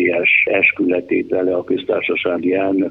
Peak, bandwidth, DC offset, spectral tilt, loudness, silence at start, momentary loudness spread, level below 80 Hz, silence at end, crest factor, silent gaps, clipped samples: -2 dBFS; 4.1 kHz; under 0.1%; -7.5 dB/octave; -16 LUFS; 0 s; 7 LU; -58 dBFS; 0 s; 14 dB; none; under 0.1%